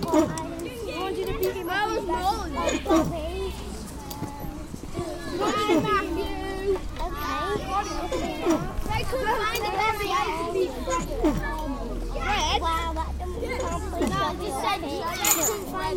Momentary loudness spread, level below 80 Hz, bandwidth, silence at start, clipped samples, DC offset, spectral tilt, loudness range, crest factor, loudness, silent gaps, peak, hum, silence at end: 10 LU; -36 dBFS; 17 kHz; 0 s; under 0.1%; under 0.1%; -4 dB/octave; 2 LU; 24 dB; -27 LUFS; none; -2 dBFS; none; 0 s